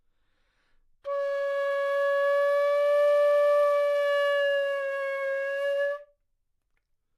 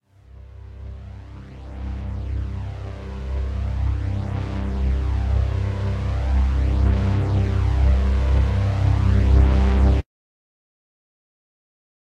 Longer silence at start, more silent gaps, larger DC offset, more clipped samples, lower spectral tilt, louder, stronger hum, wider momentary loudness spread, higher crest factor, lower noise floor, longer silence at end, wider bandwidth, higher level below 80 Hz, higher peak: first, 1.05 s vs 0.35 s; neither; neither; neither; second, 1 dB/octave vs -8.5 dB/octave; second, -25 LUFS vs -22 LUFS; neither; second, 8 LU vs 20 LU; second, 10 dB vs 16 dB; first, -75 dBFS vs -44 dBFS; second, 1.15 s vs 2 s; first, 12.5 kHz vs 6.2 kHz; second, -74 dBFS vs -22 dBFS; second, -16 dBFS vs -6 dBFS